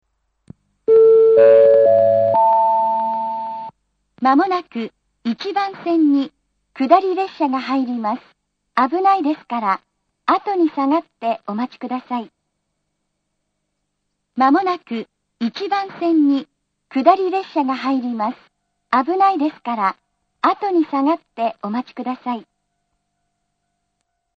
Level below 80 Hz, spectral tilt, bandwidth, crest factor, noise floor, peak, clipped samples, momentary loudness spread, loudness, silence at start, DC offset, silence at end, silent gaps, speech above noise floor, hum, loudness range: -70 dBFS; -7 dB/octave; 6.6 kHz; 18 dB; -74 dBFS; 0 dBFS; under 0.1%; 14 LU; -18 LUFS; 0.9 s; under 0.1%; 1.95 s; none; 56 dB; none; 10 LU